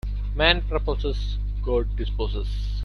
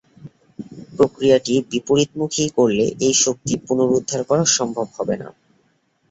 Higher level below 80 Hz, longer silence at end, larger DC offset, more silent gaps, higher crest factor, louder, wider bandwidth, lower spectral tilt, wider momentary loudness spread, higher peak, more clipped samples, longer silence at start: first, -26 dBFS vs -56 dBFS; second, 0 s vs 0.8 s; neither; neither; about the same, 20 dB vs 18 dB; second, -25 LUFS vs -19 LUFS; second, 6.2 kHz vs 8.2 kHz; first, -6.5 dB/octave vs -4 dB/octave; second, 10 LU vs 13 LU; about the same, -4 dBFS vs -2 dBFS; neither; second, 0.05 s vs 0.2 s